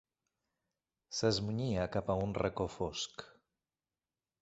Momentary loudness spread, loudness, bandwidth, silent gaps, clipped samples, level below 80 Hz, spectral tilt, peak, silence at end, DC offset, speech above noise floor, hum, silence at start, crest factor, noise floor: 9 LU; -36 LUFS; 8.2 kHz; none; under 0.1%; -58 dBFS; -5 dB/octave; -18 dBFS; 1.1 s; under 0.1%; over 54 dB; none; 1.1 s; 20 dB; under -90 dBFS